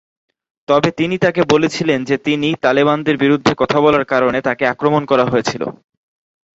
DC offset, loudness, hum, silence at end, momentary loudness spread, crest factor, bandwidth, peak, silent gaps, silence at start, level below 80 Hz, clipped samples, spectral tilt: under 0.1%; -15 LUFS; none; 0.85 s; 4 LU; 16 dB; 8 kHz; 0 dBFS; none; 0.7 s; -52 dBFS; under 0.1%; -5.5 dB/octave